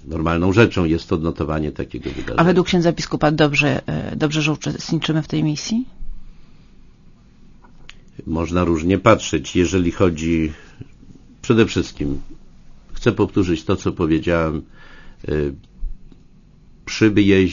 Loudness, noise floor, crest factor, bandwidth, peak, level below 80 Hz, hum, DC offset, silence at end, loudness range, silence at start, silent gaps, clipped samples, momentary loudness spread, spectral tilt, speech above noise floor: -19 LUFS; -47 dBFS; 20 dB; 7.4 kHz; 0 dBFS; -36 dBFS; none; under 0.1%; 0 s; 7 LU; 0 s; none; under 0.1%; 13 LU; -6 dB/octave; 29 dB